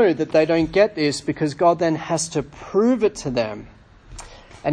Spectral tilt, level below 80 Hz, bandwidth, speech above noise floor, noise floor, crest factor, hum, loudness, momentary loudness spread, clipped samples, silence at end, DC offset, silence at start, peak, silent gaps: -5 dB/octave; -48 dBFS; 10.5 kHz; 21 dB; -41 dBFS; 16 dB; none; -20 LUFS; 12 LU; under 0.1%; 0 s; under 0.1%; 0 s; -4 dBFS; none